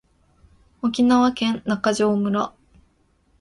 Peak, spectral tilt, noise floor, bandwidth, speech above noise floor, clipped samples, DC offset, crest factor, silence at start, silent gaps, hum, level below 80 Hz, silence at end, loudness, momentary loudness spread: -6 dBFS; -5.5 dB/octave; -62 dBFS; 11.5 kHz; 43 dB; under 0.1%; under 0.1%; 16 dB; 0.85 s; none; none; -56 dBFS; 0.9 s; -21 LUFS; 9 LU